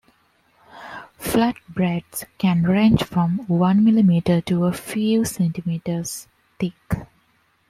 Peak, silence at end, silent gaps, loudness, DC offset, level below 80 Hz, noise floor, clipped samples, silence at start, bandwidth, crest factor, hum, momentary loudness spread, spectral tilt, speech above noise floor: -4 dBFS; 0.65 s; none; -21 LUFS; under 0.1%; -48 dBFS; -63 dBFS; under 0.1%; 0.75 s; 15.5 kHz; 18 dB; none; 15 LU; -6.5 dB/octave; 43 dB